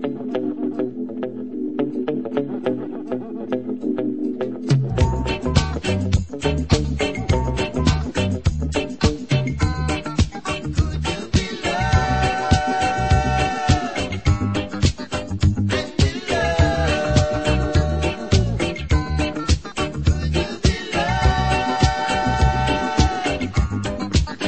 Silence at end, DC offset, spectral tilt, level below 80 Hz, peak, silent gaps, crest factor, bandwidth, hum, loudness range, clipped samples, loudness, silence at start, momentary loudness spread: 0 s; 0.7%; -5.5 dB/octave; -28 dBFS; -2 dBFS; none; 18 dB; 8.8 kHz; none; 4 LU; under 0.1%; -21 LUFS; 0 s; 7 LU